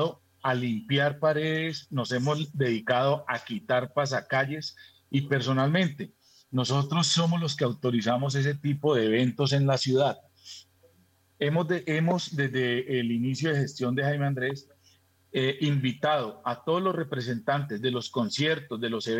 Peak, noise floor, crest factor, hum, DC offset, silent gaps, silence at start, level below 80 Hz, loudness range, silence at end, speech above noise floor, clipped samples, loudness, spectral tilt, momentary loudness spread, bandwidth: -12 dBFS; -64 dBFS; 16 dB; none; under 0.1%; none; 0 s; -76 dBFS; 3 LU; 0 s; 37 dB; under 0.1%; -27 LUFS; -5.5 dB/octave; 8 LU; 9.2 kHz